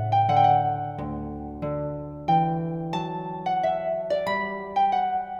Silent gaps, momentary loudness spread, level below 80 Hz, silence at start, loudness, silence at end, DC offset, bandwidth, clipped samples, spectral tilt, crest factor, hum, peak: none; 13 LU; -50 dBFS; 0 s; -25 LUFS; 0 s; under 0.1%; 7.4 kHz; under 0.1%; -7.5 dB/octave; 16 dB; none; -8 dBFS